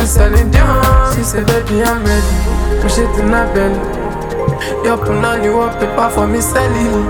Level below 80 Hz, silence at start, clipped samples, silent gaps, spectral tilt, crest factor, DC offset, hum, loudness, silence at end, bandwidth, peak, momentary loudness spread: -16 dBFS; 0 s; under 0.1%; none; -5.5 dB/octave; 12 dB; under 0.1%; none; -13 LUFS; 0 s; over 20 kHz; 0 dBFS; 6 LU